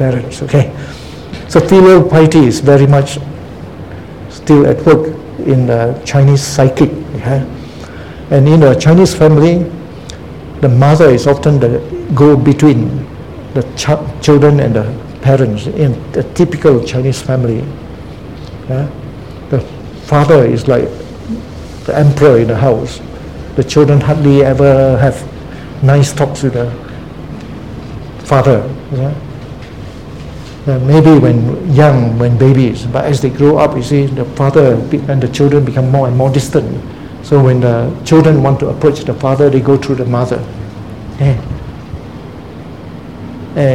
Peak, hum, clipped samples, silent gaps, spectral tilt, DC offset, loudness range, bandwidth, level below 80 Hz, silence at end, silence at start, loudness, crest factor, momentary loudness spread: 0 dBFS; none; 0.8%; none; -7.5 dB/octave; 0.8%; 7 LU; 12 kHz; -34 dBFS; 0 s; 0 s; -10 LUFS; 10 dB; 21 LU